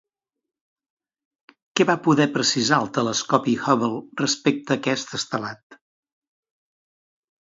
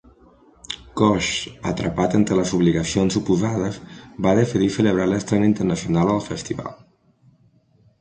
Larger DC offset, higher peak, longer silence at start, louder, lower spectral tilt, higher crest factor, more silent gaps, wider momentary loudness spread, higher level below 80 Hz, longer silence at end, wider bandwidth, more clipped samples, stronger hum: neither; about the same, -2 dBFS vs -2 dBFS; first, 1.75 s vs 0.7 s; about the same, -22 LUFS vs -21 LUFS; second, -4 dB/octave vs -6 dB/octave; about the same, 22 dB vs 18 dB; first, 5.63-5.70 s vs none; second, 9 LU vs 12 LU; second, -68 dBFS vs -46 dBFS; first, 1.8 s vs 1.25 s; second, 7.8 kHz vs 9.6 kHz; neither; neither